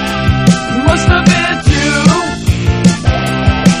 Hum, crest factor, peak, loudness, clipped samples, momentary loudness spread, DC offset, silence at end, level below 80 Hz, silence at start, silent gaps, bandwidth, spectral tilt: none; 10 dB; 0 dBFS; -11 LUFS; 0.9%; 4 LU; under 0.1%; 0 s; -20 dBFS; 0 s; none; 14.5 kHz; -5.5 dB/octave